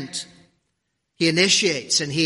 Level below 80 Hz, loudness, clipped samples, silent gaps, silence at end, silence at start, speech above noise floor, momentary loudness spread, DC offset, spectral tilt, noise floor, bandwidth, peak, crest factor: -64 dBFS; -18 LUFS; under 0.1%; none; 0 s; 0 s; 55 dB; 16 LU; under 0.1%; -2.5 dB/octave; -75 dBFS; 11.5 kHz; -4 dBFS; 20 dB